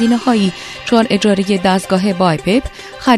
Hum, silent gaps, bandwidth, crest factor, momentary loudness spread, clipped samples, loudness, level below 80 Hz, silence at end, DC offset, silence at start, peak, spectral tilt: none; none; 13.5 kHz; 14 dB; 6 LU; under 0.1%; -14 LUFS; -40 dBFS; 0 s; under 0.1%; 0 s; 0 dBFS; -5.5 dB/octave